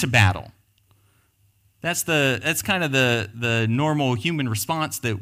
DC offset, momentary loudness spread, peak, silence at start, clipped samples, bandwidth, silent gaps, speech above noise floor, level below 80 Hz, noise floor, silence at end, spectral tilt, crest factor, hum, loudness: under 0.1%; 6 LU; -4 dBFS; 0 s; under 0.1%; 16 kHz; none; 40 dB; -54 dBFS; -62 dBFS; 0 s; -4.5 dB/octave; 20 dB; none; -22 LUFS